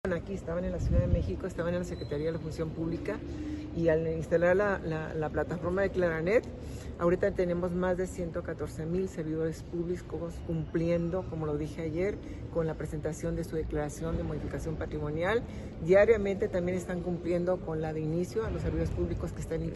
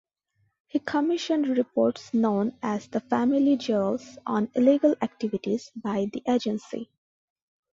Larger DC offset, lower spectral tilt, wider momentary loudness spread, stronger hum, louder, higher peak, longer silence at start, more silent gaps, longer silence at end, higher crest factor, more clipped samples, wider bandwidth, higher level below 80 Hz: neither; about the same, -7.5 dB/octave vs -6.5 dB/octave; about the same, 9 LU vs 9 LU; neither; second, -32 LUFS vs -26 LUFS; second, -12 dBFS vs -8 dBFS; second, 0.05 s vs 0.75 s; neither; second, 0 s vs 0.9 s; about the same, 20 dB vs 18 dB; neither; first, 12 kHz vs 7.6 kHz; first, -42 dBFS vs -68 dBFS